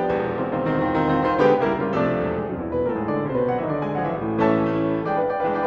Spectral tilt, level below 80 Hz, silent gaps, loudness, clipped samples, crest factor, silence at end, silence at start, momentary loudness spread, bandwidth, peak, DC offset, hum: -9 dB/octave; -48 dBFS; none; -22 LUFS; under 0.1%; 18 dB; 0 s; 0 s; 6 LU; 6.8 kHz; -4 dBFS; under 0.1%; none